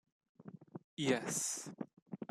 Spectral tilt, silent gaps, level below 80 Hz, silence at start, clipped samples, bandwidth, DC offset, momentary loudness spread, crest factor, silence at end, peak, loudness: -3 dB/octave; 0.84-0.97 s, 2.02-2.06 s; -82 dBFS; 0.4 s; under 0.1%; 14 kHz; under 0.1%; 21 LU; 22 dB; 0.05 s; -20 dBFS; -38 LUFS